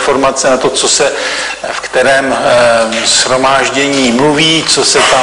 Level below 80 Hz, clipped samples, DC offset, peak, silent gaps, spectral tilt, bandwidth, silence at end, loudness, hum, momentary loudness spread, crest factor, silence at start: -42 dBFS; under 0.1%; 0.3%; 0 dBFS; none; -2 dB/octave; 11 kHz; 0 s; -9 LUFS; none; 7 LU; 10 dB; 0 s